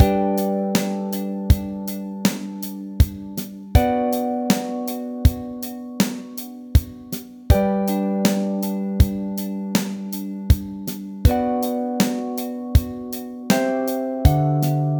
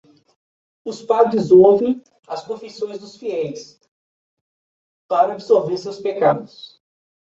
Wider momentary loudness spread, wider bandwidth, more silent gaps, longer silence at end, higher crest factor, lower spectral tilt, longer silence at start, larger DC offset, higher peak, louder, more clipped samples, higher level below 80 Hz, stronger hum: second, 11 LU vs 20 LU; first, over 20 kHz vs 7.8 kHz; second, none vs 3.88-5.09 s; second, 0 s vs 0.75 s; about the same, 20 dB vs 18 dB; about the same, -6.5 dB/octave vs -7 dB/octave; second, 0 s vs 0.85 s; neither; about the same, 0 dBFS vs -2 dBFS; second, -22 LUFS vs -18 LUFS; neither; first, -28 dBFS vs -62 dBFS; neither